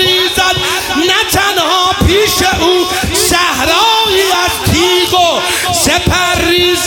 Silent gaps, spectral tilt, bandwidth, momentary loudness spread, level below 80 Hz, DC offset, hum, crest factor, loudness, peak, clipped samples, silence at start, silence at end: none; -2.5 dB/octave; 19 kHz; 3 LU; -28 dBFS; under 0.1%; none; 10 dB; -9 LUFS; 0 dBFS; under 0.1%; 0 s; 0 s